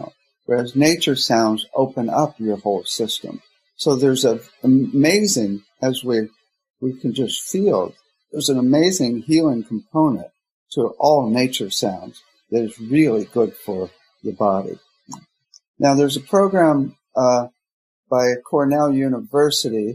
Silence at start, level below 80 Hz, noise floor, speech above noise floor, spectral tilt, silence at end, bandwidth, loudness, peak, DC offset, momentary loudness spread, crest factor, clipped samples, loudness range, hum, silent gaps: 0 s; -64 dBFS; -51 dBFS; 33 dB; -4.5 dB/octave; 0 s; 15.5 kHz; -19 LUFS; -2 dBFS; under 0.1%; 12 LU; 18 dB; under 0.1%; 3 LU; none; 6.70-6.74 s, 10.51-10.66 s, 15.68-15.74 s, 17.72-18.03 s